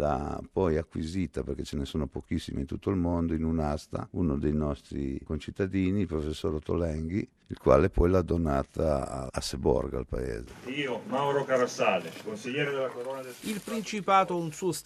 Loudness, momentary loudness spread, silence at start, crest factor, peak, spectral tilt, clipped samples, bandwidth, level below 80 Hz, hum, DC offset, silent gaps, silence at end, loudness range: -30 LUFS; 10 LU; 0 s; 22 dB; -6 dBFS; -6.5 dB/octave; under 0.1%; 13.5 kHz; -42 dBFS; none; under 0.1%; none; 0.05 s; 4 LU